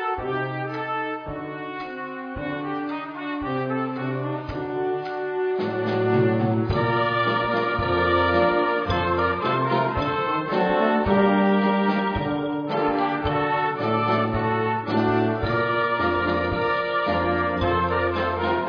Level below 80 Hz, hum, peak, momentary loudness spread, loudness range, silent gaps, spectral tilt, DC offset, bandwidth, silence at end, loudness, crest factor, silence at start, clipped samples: -44 dBFS; none; -8 dBFS; 9 LU; 7 LU; none; -8.5 dB/octave; under 0.1%; 5.4 kHz; 0 s; -23 LUFS; 16 dB; 0 s; under 0.1%